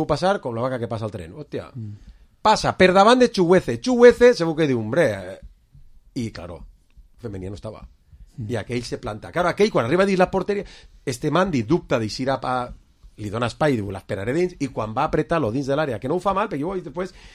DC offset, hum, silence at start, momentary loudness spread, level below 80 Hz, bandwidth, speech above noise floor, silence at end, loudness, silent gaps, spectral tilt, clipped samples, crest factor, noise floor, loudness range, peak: under 0.1%; none; 0 s; 19 LU; -46 dBFS; 13 kHz; 30 dB; 0.05 s; -21 LUFS; none; -6 dB/octave; under 0.1%; 22 dB; -51 dBFS; 13 LU; 0 dBFS